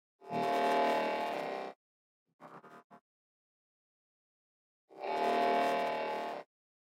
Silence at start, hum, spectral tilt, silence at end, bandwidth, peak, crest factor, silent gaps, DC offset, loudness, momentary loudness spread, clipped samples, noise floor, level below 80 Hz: 0.2 s; none; -4.5 dB/octave; 0.45 s; 16 kHz; -20 dBFS; 16 dB; 1.76-2.26 s, 2.33-2.39 s, 2.84-2.90 s, 3.01-4.88 s; under 0.1%; -34 LUFS; 17 LU; under 0.1%; under -90 dBFS; under -90 dBFS